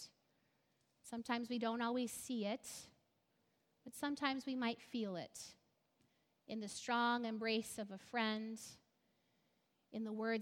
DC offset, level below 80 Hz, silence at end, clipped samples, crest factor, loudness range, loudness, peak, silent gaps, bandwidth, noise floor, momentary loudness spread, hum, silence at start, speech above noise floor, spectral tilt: under 0.1%; -84 dBFS; 0 s; under 0.1%; 22 dB; 3 LU; -42 LUFS; -22 dBFS; none; 17 kHz; -81 dBFS; 15 LU; none; 0 s; 39 dB; -3.5 dB/octave